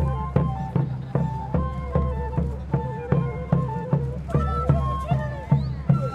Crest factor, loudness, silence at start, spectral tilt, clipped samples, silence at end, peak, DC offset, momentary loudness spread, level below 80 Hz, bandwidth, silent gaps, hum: 18 dB; -25 LUFS; 0 s; -10 dB/octave; under 0.1%; 0 s; -6 dBFS; under 0.1%; 4 LU; -32 dBFS; 5.2 kHz; none; none